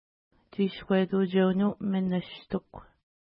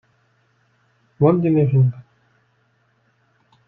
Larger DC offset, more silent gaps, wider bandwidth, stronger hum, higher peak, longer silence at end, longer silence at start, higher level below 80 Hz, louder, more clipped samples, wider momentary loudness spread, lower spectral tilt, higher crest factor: neither; neither; first, 5.2 kHz vs 3.6 kHz; neither; second, -12 dBFS vs -2 dBFS; second, 0.5 s vs 1.65 s; second, 0.6 s vs 1.2 s; about the same, -62 dBFS vs -60 dBFS; second, -28 LUFS vs -17 LUFS; neither; first, 11 LU vs 5 LU; second, -11.5 dB/octave vs -13 dB/octave; about the same, 16 dB vs 20 dB